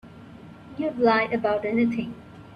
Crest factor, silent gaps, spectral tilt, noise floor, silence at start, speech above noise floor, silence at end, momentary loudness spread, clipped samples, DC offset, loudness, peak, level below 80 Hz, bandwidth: 18 dB; none; -7.5 dB/octave; -45 dBFS; 0.05 s; 21 dB; 0 s; 24 LU; under 0.1%; under 0.1%; -24 LUFS; -8 dBFS; -58 dBFS; 6.4 kHz